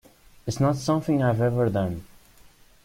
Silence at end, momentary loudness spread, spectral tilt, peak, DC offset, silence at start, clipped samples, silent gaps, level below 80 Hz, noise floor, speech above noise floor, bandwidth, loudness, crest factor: 0.8 s; 12 LU; -7 dB/octave; -8 dBFS; under 0.1%; 0.45 s; under 0.1%; none; -52 dBFS; -53 dBFS; 30 dB; 16 kHz; -24 LUFS; 18 dB